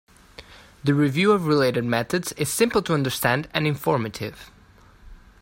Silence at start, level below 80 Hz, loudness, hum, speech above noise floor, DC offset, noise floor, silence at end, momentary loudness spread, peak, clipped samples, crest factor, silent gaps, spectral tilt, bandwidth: 0.4 s; -52 dBFS; -22 LUFS; none; 29 dB; under 0.1%; -51 dBFS; 0.25 s; 8 LU; -4 dBFS; under 0.1%; 20 dB; none; -5 dB/octave; 16.5 kHz